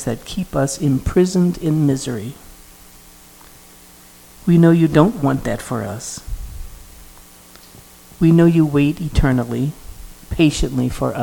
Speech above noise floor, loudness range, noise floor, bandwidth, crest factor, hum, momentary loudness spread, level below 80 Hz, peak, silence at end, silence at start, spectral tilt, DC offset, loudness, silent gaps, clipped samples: 28 dB; 5 LU; -44 dBFS; 19 kHz; 18 dB; none; 17 LU; -32 dBFS; 0 dBFS; 0 s; 0 s; -6.5 dB/octave; under 0.1%; -17 LUFS; none; under 0.1%